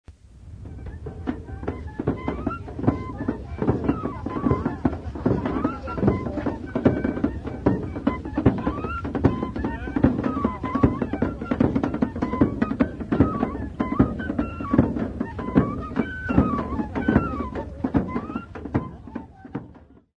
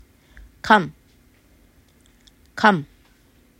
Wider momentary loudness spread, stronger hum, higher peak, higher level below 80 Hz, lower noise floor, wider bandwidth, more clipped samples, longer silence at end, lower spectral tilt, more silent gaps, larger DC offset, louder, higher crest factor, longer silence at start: second, 10 LU vs 21 LU; neither; second, -4 dBFS vs 0 dBFS; first, -38 dBFS vs -54 dBFS; second, -48 dBFS vs -56 dBFS; second, 7 kHz vs 15.5 kHz; neither; second, 0.2 s vs 0.75 s; first, -9.5 dB/octave vs -5.5 dB/octave; neither; neither; second, -25 LUFS vs -19 LUFS; about the same, 22 dB vs 24 dB; second, 0.1 s vs 0.65 s